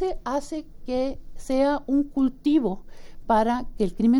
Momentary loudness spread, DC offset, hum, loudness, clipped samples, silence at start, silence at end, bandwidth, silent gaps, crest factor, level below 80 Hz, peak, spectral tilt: 13 LU; under 0.1%; none; -25 LUFS; under 0.1%; 0 s; 0 s; 12 kHz; none; 14 dB; -40 dBFS; -10 dBFS; -6.5 dB/octave